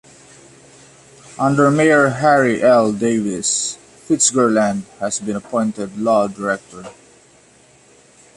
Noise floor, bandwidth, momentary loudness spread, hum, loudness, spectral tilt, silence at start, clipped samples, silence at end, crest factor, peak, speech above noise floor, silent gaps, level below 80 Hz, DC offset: -50 dBFS; 11.5 kHz; 11 LU; none; -16 LUFS; -4 dB/octave; 1.3 s; under 0.1%; 1.45 s; 16 dB; -2 dBFS; 34 dB; none; -58 dBFS; under 0.1%